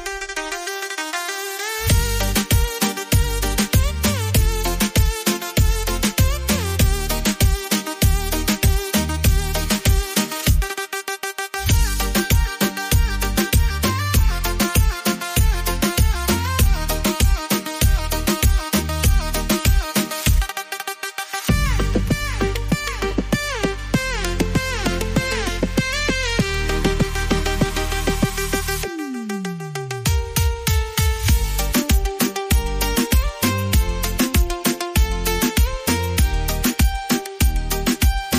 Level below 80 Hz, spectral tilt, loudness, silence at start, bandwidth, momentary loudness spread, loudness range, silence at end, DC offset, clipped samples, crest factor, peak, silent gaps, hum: -22 dBFS; -4 dB/octave; -20 LUFS; 0 s; 15.5 kHz; 6 LU; 2 LU; 0 s; under 0.1%; under 0.1%; 14 dB; -6 dBFS; none; none